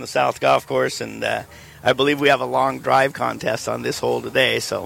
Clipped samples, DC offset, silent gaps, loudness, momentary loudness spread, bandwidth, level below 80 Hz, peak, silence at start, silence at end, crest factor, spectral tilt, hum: under 0.1%; under 0.1%; none; -20 LUFS; 7 LU; 17 kHz; -54 dBFS; -4 dBFS; 0 s; 0 s; 16 dB; -4 dB/octave; none